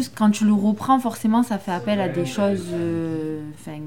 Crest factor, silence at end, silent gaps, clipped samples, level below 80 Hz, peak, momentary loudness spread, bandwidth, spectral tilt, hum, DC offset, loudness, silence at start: 16 dB; 0 s; none; under 0.1%; -58 dBFS; -6 dBFS; 9 LU; 16.5 kHz; -6.5 dB/octave; none; 0.4%; -22 LUFS; 0 s